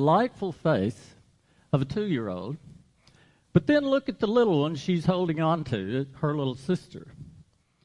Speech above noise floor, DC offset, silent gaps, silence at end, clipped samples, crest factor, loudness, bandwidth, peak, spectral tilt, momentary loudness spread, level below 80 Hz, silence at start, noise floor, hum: 37 dB; under 0.1%; none; 0.55 s; under 0.1%; 20 dB; -27 LUFS; 11 kHz; -6 dBFS; -7.5 dB/octave; 13 LU; -58 dBFS; 0 s; -63 dBFS; none